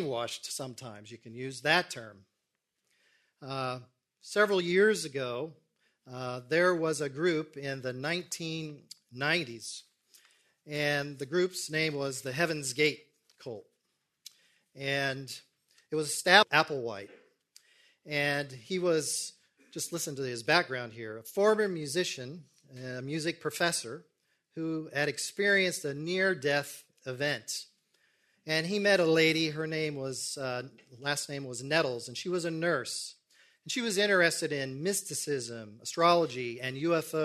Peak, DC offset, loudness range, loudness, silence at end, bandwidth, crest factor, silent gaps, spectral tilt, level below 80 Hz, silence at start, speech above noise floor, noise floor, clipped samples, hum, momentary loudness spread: -4 dBFS; under 0.1%; 6 LU; -30 LUFS; 0 s; 13.5 kHz; 28 dB; none; -3.5 dB/octave; -76 dBFS; 0 s; 52 dB; -84 dBFS; under 0.1%; none; 18 LU